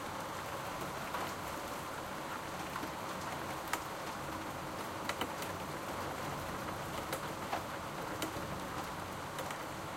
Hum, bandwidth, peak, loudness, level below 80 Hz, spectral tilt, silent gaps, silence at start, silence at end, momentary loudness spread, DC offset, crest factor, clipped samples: none; 16.5 kHz; -16 dBFS; -41 LUFS; -60 dBFS; -3.5 dB/octave; none; 0 s; 0 s; 2 LU; under 0.1%; 24 dB; under 0.1%